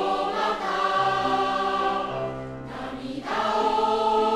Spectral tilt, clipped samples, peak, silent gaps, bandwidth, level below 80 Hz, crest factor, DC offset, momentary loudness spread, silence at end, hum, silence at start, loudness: -4.5 dB/octave; under 0.1%; -10 dBFS; none; 13 kHz; -52 dBFS; 14 dB; under 0.1%; 11 LU; 0 s; none; 0 s; -25 LUFS